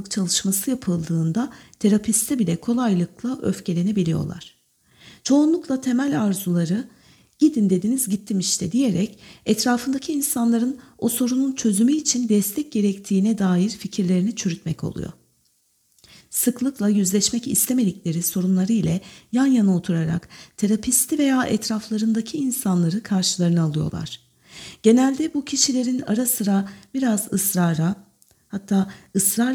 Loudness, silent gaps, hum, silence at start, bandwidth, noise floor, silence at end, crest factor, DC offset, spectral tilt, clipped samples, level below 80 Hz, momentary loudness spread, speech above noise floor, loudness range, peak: -21 LUFS; none; none; 0 s; 19.5 kHz; -65 dBFS; 0 s; 18 dB; under 0.1%; -5 dB/octave; under 0.1%; -56 dBFS; 9 LU; 44 dB; 3 LU; -4 dBFS